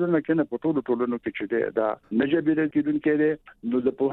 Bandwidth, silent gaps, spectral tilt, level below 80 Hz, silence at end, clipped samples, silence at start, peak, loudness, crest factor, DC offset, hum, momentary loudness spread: 4.1 kHz; none; -10 dB/octave; -64 dBFS; 0 s; under 0.1%; 0 s; -10 dBFS; -25 LUFS; 14 dB; under 0.1%; none; 5 LU